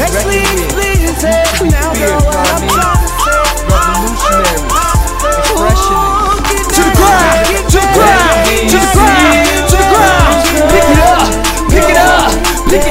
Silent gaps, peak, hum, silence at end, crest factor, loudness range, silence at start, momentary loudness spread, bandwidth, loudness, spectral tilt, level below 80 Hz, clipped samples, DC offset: none; 0 dBFS; none; 0 s; 8 dB; 3 LU; 0 s; 5 LU; 16.5 kHz; -9 LUFS; -4 dB/octave; -16 dBFS; 0.5%; under 0.1%